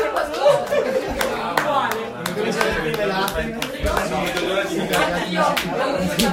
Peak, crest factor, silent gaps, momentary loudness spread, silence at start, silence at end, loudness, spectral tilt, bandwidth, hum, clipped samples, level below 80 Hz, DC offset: 0 dBFS; 20 dB; none; 5 LU; 0 s; 0 s; -21 LUFS; -4 dB/octave; 16.5 kHz; none; under 0.1%; -38 dBFS; under 0.1%